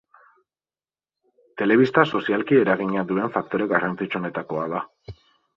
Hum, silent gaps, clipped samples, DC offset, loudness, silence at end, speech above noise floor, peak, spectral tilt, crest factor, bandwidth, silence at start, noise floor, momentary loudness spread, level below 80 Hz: none; none; under 0.1%; under 0.1%; -22 LUFS; 0.45 s; over 68 dB; -2 dBFS; -8 dB/octave; 22 dB; 7.2 kHz; 1.55 s; under -90 dBFS; 10 LU; -60 dBFS